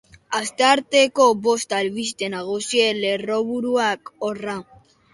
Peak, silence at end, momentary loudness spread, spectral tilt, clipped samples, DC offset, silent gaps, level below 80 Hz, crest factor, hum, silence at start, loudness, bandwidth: -2 dBFS; 0.5 s; 11 LU; -2.5 dB/octave; under 0.1%; under 0.1%; none; -64 dBFS; 18 dB; none; 0.3 s; -20 LUFS; 11.5 kHz